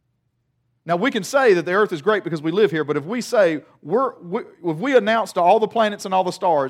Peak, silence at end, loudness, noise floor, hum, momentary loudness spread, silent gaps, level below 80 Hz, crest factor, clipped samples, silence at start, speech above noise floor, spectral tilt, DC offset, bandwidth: -4 dBFS; 0 s; -20 LUFS; -70 dBFS; none; 9 LU; none; -76 dBFS; 16 dB; under 0.1%; 0.85 s; 50 dB; -5 dB/octave; under 0.1%; 15.5 kHz